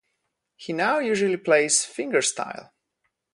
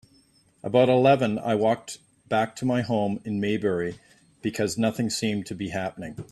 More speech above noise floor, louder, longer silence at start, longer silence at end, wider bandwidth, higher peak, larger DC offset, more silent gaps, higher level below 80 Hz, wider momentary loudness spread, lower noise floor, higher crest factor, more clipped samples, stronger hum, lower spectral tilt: first, 54 dB vs 36 dB; about the same, -23 LUFS vs -25 LUFS; about the same, 0.6 s vs 0.65 s; first, 0.7 s vs 0.05 s; second, 11.5 kHz vs 13.5 kHz; about the same, -4 dBFS vs -6 dBFS; neither; neither; second, -74 dBFS vs -62 dBFS; about the same, 15 LU vs 14 LU; first, -78 dBFS vs -61 dBFS; about the same, 20 dB vs 20 dB; neither; neither; second, -2.5 dB/octave vs -5.5 dB/octave